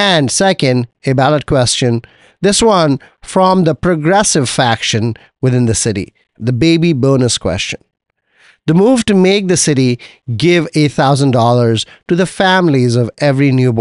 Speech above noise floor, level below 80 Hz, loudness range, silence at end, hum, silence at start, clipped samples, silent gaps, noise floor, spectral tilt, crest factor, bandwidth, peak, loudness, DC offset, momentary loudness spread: 38 dB; -42 dBFS; 2 LU; 0 s; none; 0 s; under 0.1%; none; -50 dBFS; -5 dB/octave; 12 dB; 11.5 kHz; 0 dBFS; -12 LUFS; 0.1%; 8 LU